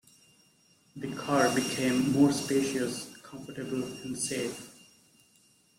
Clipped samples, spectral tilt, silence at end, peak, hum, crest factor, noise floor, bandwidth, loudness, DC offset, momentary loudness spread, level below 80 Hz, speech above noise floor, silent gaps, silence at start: under 0.1%; -4.5 dB/octave; 1.05 s; -12 dBFS; none; 20 dB; -65 dBFS; 16 kHz; -29 LUFS; under 0.1%; 18 LU; -66 dBFS; 36 dB; none; 0.95 s